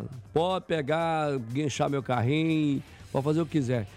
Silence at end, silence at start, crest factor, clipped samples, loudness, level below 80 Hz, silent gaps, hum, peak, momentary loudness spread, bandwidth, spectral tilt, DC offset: 0 s; 0 s; 14 dB; under 0.1%; -28 LUFS; -58 dBFS; none; none; -14 dBFS; 5 LU; 13.5 kHz; -6.5 dB/octave; under 0.1%